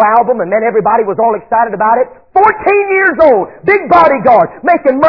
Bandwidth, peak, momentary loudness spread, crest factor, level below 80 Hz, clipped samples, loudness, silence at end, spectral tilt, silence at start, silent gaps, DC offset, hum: 5.4 kHz; 0 dBFS; 5 LU; 10 dB; -46 dBFS; 0.8%; -10 LUFS; 0 s; -8.5 dB/octave; 0 s; none; 0.3%; none